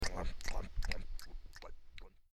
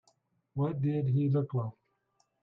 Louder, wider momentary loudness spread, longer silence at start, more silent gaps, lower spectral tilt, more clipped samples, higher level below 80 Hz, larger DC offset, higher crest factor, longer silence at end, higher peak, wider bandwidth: second, -46 LUFS vs -32 LUFS; first, 15 LU vs 11 LU; second, 0 s vs 0.55 s; neither; second, -3.5 dB/octave vs -11.5 dB/octave; neither; first, -42 dBFS vs -70 dBFS; neither; about the same, 18 dB vs 14 dB; second, 0.25 s vs 0.7 s; about the same, -22 dBFS vs -20 dBFS; first, 13.5 kHz vs 4.1 kHz